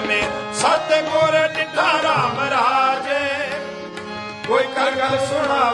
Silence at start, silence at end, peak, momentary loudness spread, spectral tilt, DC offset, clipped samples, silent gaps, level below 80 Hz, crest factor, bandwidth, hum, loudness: 0 s; 0 s; -4 dBFS; 12 LU; -3.5 dB/octave; under 0.1%; under 0.1%; none; -56 dBFS; 16 dB; 11.5 kHz; none; -18 LUFS